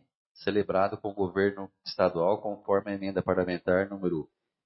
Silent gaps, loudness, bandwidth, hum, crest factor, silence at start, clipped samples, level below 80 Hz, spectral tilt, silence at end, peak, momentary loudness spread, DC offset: none; -29 LUFS; 6 kHz; none; 20 dB; 0.4 s; under 0.1%; -64 dBFS; -9.5 dB/octave; 0.4 s; -10 dBFS; 9 LU; under 0.1%